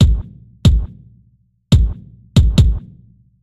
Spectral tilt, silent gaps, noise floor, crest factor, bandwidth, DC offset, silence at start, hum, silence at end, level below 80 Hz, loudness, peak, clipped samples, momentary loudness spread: -7 dB/octave; none; -56 dBFS; 14 dB; 12 kHz; under 0.1%; 0 s; none; 0.65 s; -18 dBFS; -16 LUFS; 0 dBFS; under 0.1%; 17 LU